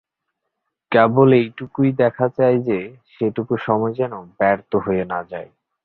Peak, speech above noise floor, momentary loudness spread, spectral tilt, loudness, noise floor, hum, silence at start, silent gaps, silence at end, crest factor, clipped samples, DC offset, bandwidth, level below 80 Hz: -2 dBFS; 60 dB; 12 LU; -11 dB/octave; -19 LUFS; -78 dBFS; none; 0.9 s; none; 0.4 s; 18 dB; under 0.1%; under 0.1%; 4.4 kHz; -56 dBFS